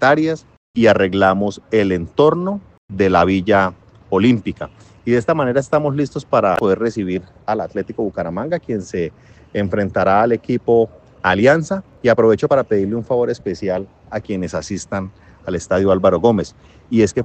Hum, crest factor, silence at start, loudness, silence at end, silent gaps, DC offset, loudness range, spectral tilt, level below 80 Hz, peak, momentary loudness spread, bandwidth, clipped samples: none; 16 dB; 0 s; -17 LUFS; 0 s; 0.57-0.74 s, 2.78-2.88 s; under 0.1%; 5 LU; -6.5 dB/octave; -50 dBFS; 0 dBFS; 12 LU; 8.8 kHz; under 0.1%